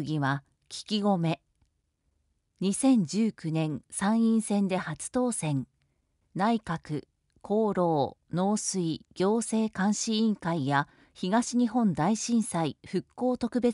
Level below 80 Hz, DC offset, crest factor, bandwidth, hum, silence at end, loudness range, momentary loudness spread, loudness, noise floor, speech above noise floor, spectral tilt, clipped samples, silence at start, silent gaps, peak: -64 dBFS; under 0.1%; 16 dB; 11.5 kHz; none; 0 s; 3 LU; 9 LU; -28 LUFS; -75 dBFS; 48 dB; -5.5 dB/octave; under 0.1%; 0 s; none; -14 dBFS